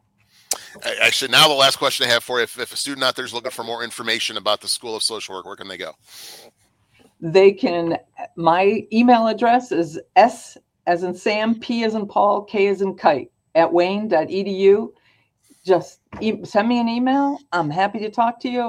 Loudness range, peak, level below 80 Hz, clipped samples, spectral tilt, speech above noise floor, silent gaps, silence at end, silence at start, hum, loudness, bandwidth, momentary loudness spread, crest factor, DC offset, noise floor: 6 LU; 0 dBFS; -64 dBFS; under 0.1%; -3.5 dB/octave; 40 dB; none; 0 s; 0.5 s; none; -19 LUFS; 17 kHz; 15 LU; 18 dB; under 0.1%; -60 dBFS